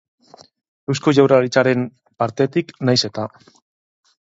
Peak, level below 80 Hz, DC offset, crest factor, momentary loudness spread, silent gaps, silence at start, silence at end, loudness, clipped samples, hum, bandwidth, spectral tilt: 0 dBFS; -62 dBFS; under 0.1%; 20 dB; 15 LU; none; 0.9 s; 0.95 s; -18 LUFS; under 0.1%; none; 7.8 kHz; -5.5 dB/octave